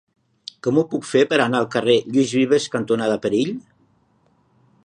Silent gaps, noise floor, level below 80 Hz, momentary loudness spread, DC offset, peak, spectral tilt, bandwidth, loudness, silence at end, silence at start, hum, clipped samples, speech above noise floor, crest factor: none; -61 dBFS; -64 dBFS; 9 LU; under 0.1%; -2 dBFS; -5 dB/octave; 10.5 kHz; -19 LUFS; 1.25 s; 0.65 s; none; under 0.1%; 42 dB; 18 dB